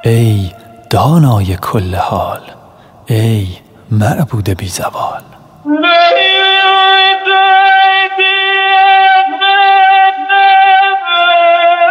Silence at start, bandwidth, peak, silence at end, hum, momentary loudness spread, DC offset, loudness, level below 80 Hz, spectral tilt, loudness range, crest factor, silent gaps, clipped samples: 0.05 s; 16.5 kHz; 0 dBFS; 0 s; none; 11 LU; under 0.1%; -8 LUFS; -48 dBFS; -5 dB/octave; 9 LU; 10 dB; none; under 0.1%